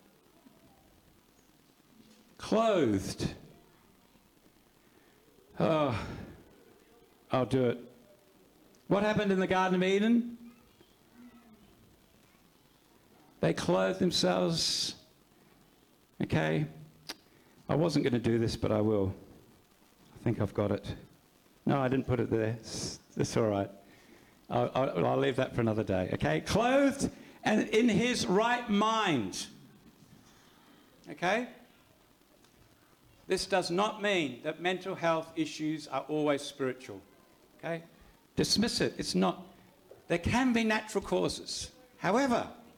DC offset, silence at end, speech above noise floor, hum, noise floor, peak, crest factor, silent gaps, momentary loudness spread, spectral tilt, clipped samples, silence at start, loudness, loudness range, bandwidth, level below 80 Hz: under 0.1%; 0.15 s; 34 dB; none; -64 dBFS; -16 dBFS; 18 dB; none; 13 LU; -5 dB/octave; under 0.1%; 2.4 s; -31 LUFS; 7 LU; 19 kHz; -60 dBFS